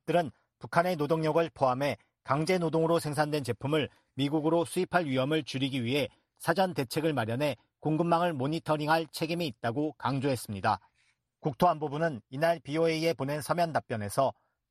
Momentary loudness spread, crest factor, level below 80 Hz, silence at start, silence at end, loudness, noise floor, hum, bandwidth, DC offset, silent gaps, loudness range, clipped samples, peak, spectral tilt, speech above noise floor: 6 LU; 20 dB; -66 dBFS; 0.1 s; 0.4 s; -30 LUFS; -73 dBFS; none; 13.5 kHz; under 0.1%; none; 2 LU; under 0.1%; -10 dBFS; -6 dB/octave; 44 dB